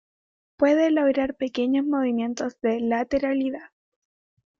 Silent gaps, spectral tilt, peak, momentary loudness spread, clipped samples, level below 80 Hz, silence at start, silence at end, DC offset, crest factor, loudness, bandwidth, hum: none; -5 dB/octave; -8 dBFS; 7 LU; under 0.1%; -58 dBFS; 0.6 s; 0.95 s; under 0.1%; 18 dB; -24 LUFS; 7.2 kHz; none